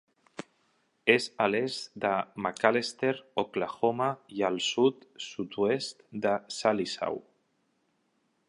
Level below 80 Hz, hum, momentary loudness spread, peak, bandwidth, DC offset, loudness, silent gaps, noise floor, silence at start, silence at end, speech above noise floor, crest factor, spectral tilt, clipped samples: -74 dBFS; none; 13 LU; -4 dBFS; 11.5 kHz; under 0.1%; -29 LUFS; none; -74 dBFS; 0.4 s; 1.3 s; 45 dB; 26 dB; -4 dB/octave; under 0.1%